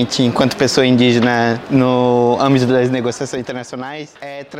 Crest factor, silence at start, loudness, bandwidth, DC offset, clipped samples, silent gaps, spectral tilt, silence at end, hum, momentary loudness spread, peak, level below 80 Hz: 14 dB; 0 s; -14 LUFS; 14 kHz; under 0.1%; under 0.1%; none; -5.5 dB/octave; 0 s; none; 15 LU; -2 dBFS; -50 dBFS